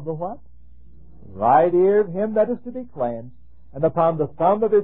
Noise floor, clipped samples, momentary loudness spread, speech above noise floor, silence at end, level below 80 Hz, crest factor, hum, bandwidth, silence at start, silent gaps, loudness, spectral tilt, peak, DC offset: -48 dBFS; under 0.1%; 17 LU; 29 dB; 0 s; -52 dBFS; 16 dB; none; 3.8 kHz; 0 s; none; -20 LUFS; -12 dB/octave; -6 dBFS; 1%